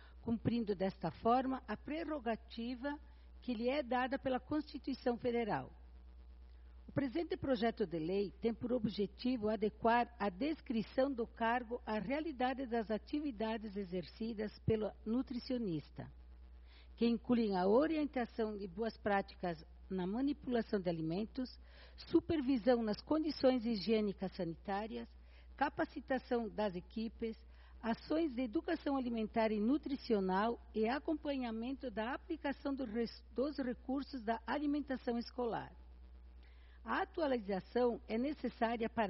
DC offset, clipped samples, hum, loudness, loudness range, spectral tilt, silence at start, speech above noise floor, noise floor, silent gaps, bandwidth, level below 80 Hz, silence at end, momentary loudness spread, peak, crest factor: under 0.1%; under 0.1%; none; -39 LUFS; 4 LU; -5 dB/octave; 0 s; 20 dB; -58 dBFS; none; 5.8 kHz; -58 dBFS; 0 s; 9 LU; -20 dBFS; 20 dB